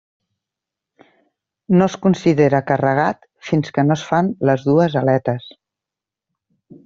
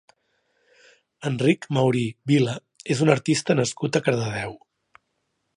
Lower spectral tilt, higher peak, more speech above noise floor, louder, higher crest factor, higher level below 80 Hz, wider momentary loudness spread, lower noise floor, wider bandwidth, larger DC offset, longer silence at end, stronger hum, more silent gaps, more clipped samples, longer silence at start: first, -7.5 dB/octave vs -5.5 dB/octave; about the same, -2 dBFS vs -2 dBFS; first, 70 dB vs 53 dB; first, -17 LUFS vs -23 LUFS; about the same, 18 dB vs 22 dB; first, -56 dBFS vs -62 dBFS; second, 7 LU vs 10 LU; first, -86 dBFS vs -75 dBFS; second, 7.4 kHz vs 11.5 kHz; neither; first, 1.35 s vs 1 s; neither; neither; neither; first, 1.7 s vs 1.2 s